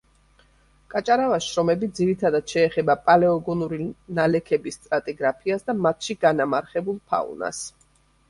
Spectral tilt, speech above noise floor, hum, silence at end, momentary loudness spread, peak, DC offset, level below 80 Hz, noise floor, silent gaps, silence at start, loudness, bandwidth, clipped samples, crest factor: -5.5 dB/octave; 38 dB; none; 0.6 s; 10 LU; -2 dBFS; under 0.1%; -58 dBFS; -60 dBFS; none; 0.9 s; -23 LUFS; 11.5 kHz; under 0.1%; 20 dB